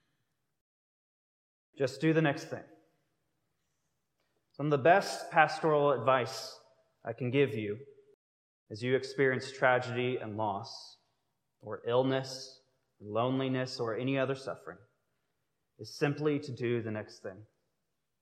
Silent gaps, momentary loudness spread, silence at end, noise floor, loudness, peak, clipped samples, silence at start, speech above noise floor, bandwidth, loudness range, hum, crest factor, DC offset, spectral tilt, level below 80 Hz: 8.14-8.66 s; 18 LU; 0.75 s; -85 dBFS; -31 LUFS; -8 dBFS; under 0.1%; 1.75 s; 53 dB; 14.5 kHz; 6 LU; none; 26 dB; under 0.1%; -6 dB/octave; -86 dBFS